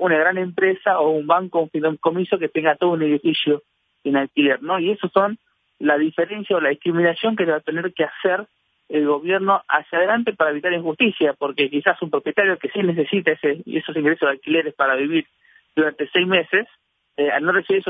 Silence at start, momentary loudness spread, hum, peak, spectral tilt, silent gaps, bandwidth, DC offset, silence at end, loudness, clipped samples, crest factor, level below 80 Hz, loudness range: 0 s; 5 LU; none; 0 dBFS; -8.5 dB/octave; none; 4.8 kHz; under 0.1%; 0 s; -20 LUFS; under 0.1%; 20 dB; -72 dBFS; 1 LU